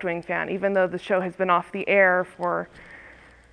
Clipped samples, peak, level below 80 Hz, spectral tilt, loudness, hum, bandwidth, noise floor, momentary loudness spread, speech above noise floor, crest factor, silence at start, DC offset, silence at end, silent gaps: under 0.1%; -6 dBFS; -60 dBFS; -7 dB/octave; -23 LUFS; none; 10 kHz; -49 dBFS; 9 LU; 26 dB; 18 dB; 0 s; under 0.1%; 0.4 s; none